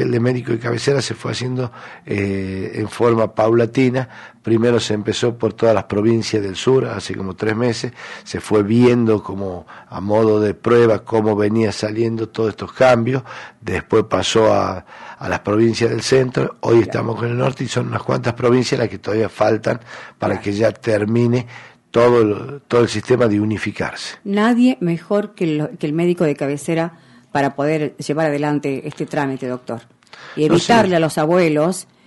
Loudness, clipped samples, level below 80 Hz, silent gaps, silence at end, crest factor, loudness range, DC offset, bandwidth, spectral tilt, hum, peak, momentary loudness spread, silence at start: -18 LUFS; under 0.1%; -52 dBFS; none; 0.25 s; 14 dB; 3 LU; under 0.1%; 11.5 kHz; -6 dB/octave; none; -4 dBFS; 12 LU; 0 s